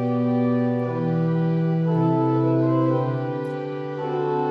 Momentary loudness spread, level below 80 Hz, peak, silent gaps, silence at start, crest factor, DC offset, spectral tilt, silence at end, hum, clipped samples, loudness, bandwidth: 8 LU; -68 dBFS; -10 dBFS; none; 0 s; 12 dB; under 0.1%; -10.5 dB/octave; 0 s; none; under 0.1%; -23 LUFS; 5.4 kHz